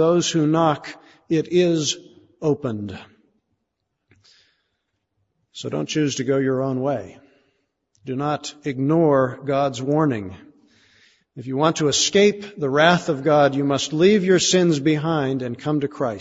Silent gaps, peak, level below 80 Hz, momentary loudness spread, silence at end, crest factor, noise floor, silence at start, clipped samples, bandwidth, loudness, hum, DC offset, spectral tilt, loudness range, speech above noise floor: none; -2 dBFS; -60 dBFS; 13 LU; 0 s; 20 dB; -77 dBFS; 0 s; under 0.1%; 8 kHz; -20 LUFS; none; under 0.1%; -5 dB/octave; 12 LU; 57 dB